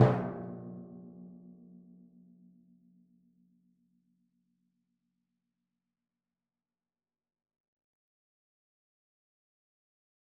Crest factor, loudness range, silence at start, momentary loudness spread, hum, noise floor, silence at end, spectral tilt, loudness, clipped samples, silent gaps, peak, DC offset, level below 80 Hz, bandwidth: 30 dB; 22 LU; 0 s; 24 LU; none; under -90 dBFS; 8.7 s; -7 dB/octave; -36 LUFS; under 0.1%; none; -8 dBFS; under 0.1%; -70 dBFS; 2.8 kHz